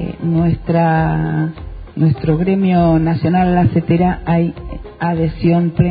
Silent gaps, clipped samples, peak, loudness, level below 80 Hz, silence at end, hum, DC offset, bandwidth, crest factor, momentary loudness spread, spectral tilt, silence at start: none; under 0.1%; -2 dBFS; -15 LUFS; -32 dBFS; 0 s; none; under 0.1%; 5 kHz; 14 dB; 9 LU; -13 dB/octave; 0 s